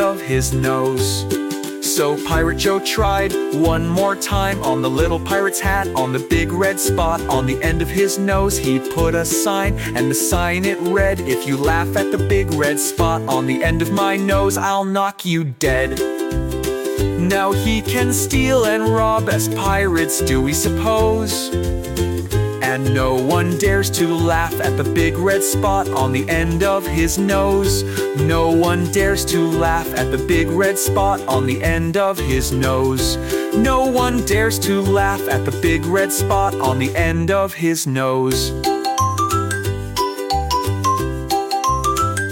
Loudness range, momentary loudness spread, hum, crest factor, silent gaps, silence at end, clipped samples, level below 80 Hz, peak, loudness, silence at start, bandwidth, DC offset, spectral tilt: 2 LU; 4 LU; none; 12 dB; none; 0 s; under 0.1%; -30 dBFS; -4 dBFS; -18 LUFS; 0 s; 17 kHz; under 0.1%; -4.5 dB/octave